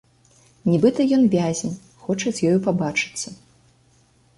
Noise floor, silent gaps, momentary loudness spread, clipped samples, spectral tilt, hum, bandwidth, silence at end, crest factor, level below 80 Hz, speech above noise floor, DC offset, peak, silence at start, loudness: -58 dBFS; none; 14 LU; under 0.1%; -5.5 dB/octave; none; 11.5 kHz; 1.05 s; 18 dB; -58 dBFS; 38 dB; under 0.1%; -4 dBFS; 0.65 s; -21 LUFS